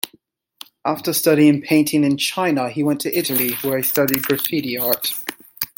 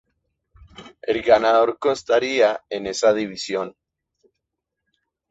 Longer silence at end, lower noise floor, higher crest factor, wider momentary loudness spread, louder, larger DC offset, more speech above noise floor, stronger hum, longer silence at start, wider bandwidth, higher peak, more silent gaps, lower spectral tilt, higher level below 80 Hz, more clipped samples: second, 0.1 s vs 1.6 s; second, -57 dBFS vs -81 dBFS; about the same, 20 dB vs 20 dB; about the same, 10 LU vs 12 LU; about the same, -18 LUFS vs -20 LUFS; neither; second, 39 dB vs 62 dB; neither; second, 0.05 s vs 0.8 s; first, 17 kHz vs 8 kHz; about the same, 0 dBFS vs -2 dBFS; neither; about the same, -4 dB/octave vs -3.5 dB/octave; about the same, -62 dBFS vs -58 dBFS; neither